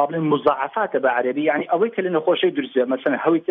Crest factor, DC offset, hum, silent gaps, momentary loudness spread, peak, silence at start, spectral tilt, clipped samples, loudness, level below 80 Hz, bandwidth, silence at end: 16 dB; under 0.1%; none; none; 3 LU; -4 dBFS; 0 s; -9 dB/octave; under 0.1%; -20 LUFS; -68 dBFS; 4.1 kHz; 0.1 s